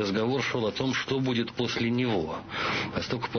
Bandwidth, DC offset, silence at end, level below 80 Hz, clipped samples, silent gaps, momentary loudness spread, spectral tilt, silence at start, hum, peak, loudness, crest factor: 6.6 kHz; under 0.1%; 0 s; -54 dBFS; under 0.1%; none; 4 LU; -5.5 dB/octave; 0 s; none; -16 dBFS; -28 LUFS; 12 dB